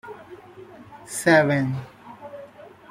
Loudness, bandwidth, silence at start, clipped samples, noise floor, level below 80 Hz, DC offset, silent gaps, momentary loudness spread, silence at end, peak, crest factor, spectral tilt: -21 LUFS; 16 kHz; 0.05 s; under 0.1%; -45 dBFS; -62 dBFS; under 0.1%; none; 27 LU; 0.25 s; -4 dBFS; 20 dB; -5.5 dB/octave